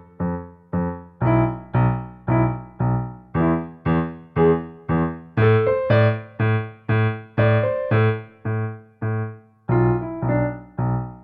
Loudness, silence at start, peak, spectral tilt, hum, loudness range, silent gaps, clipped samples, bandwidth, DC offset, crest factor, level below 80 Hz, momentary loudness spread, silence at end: -22 LUFS; 0.2 s; -4 dBFS; -11.5 dB/octave; none; 3 LU; none; under 0.1%; 4.5 kHz; under 0.1%; 16 dB; -42 dBFS; 9 LU; 0.05 s